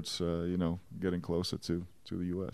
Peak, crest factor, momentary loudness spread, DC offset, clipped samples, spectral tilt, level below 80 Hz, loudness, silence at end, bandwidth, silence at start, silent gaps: -20 dBFS; 16 dB; 5 LU; 0.1%; under 0.1%; -6 dB/octave; -56 dBFS; -36 LUFS; 0.05 s; 14.5 kHz; 0 s; none